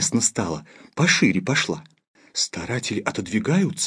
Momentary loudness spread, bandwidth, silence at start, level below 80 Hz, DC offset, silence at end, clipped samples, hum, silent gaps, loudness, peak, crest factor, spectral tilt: 12 LU; 11 kHz; 0 s; -58 dBFS; under 0.1%; 0 s; under 0.1%; none; 2.07-2.14 s; -22 LUFS; -2 dBFS; 20 dB; -3.5 dB/octave